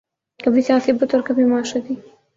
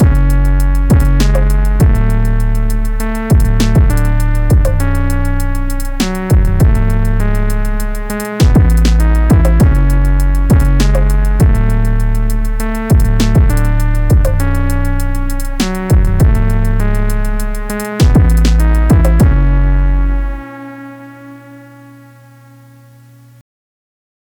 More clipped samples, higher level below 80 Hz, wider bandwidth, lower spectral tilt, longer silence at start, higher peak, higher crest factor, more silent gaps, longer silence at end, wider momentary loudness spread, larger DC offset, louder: neither; second, -60 dBFS vs -12 dBFS; second, 7.8 kHz vs 18 kHz; second, -5 dB/octave vs -7 dB/octave; first, 0.4 s vs 0 s; about the same, -4 dBFS vs -2 dBFS; first, 16 dB vs 10 dB; neither; second, 0.35 s vs 2.8 s; about the same, 10 LU vs 10 LU; neither; second, -18 LUFS vs -13 LUFS